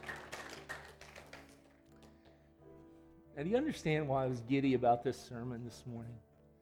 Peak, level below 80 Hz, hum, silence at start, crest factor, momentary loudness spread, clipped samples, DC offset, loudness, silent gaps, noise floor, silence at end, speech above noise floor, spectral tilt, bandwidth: -20 dBFS; -64 dBFS; none; 0 s; 20 dB; 22 LU; under 0.1%; under 0.1%; -37 LUFS; none; -63 dBFS; 0.45 s; 28 dB; -6.5 dB/octave; 15.5 kHz